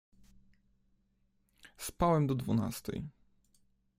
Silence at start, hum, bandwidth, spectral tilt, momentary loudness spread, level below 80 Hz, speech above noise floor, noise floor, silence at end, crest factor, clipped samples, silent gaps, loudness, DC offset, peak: 1.65 s; none; 16 kHz; -6.5 dB/octave; 15 LU; -56 dBFS; 42 dB; -74 dBFS; 0.9 s; 22 dB; under 0.1%; none; -34 LUFS; under 0.1%; -14 dBFS